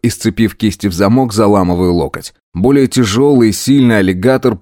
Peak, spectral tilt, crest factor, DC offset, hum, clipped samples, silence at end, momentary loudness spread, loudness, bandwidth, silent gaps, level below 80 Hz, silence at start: 0 dBFS; -6 dB/octave; 12 dB; under 0.1%; none; under 0.1%; 0.05 s; 6 LU; -11 LUFS; 17.5 kHz; 2.43-2.52 s; -38 dBFS; 0.05 s